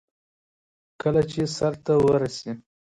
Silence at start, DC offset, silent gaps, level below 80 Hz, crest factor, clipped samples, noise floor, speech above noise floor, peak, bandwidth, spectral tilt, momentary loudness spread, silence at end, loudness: 1.05 s; under 0.1%; none; -54 dBFS; 16 dB; under 0.1%; under -90 dBFS; over 67 dB; -10 dBFS; 11 kHz; -6.5 dB/octave; 11 LU; 0.25 s; -23 LUFS